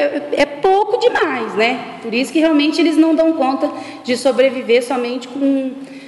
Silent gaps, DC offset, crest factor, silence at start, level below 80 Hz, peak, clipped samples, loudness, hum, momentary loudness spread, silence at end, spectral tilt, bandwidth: none; under 0.1%; 16 dB; 0 s; -56 dBFS; 0 dBFS; under 0.1%; -16 LUFS; none; 8 LU; 0 s; -4 dB/octave; 11.5 kHz